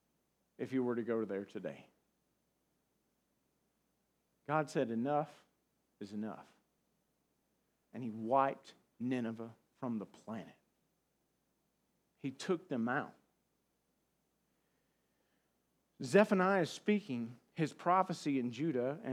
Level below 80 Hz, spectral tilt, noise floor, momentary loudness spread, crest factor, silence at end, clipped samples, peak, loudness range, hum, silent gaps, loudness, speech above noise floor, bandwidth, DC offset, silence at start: under -90 dBFS; -6.5 dB/octave; -81 dBFS; 16 LU; 26 dB; 0 s; under 0.1%; -14 dBFS; 11 LU; none; none; -37 LUFS; 45 dB; 14 kHz; under 0.1%; 0.6 s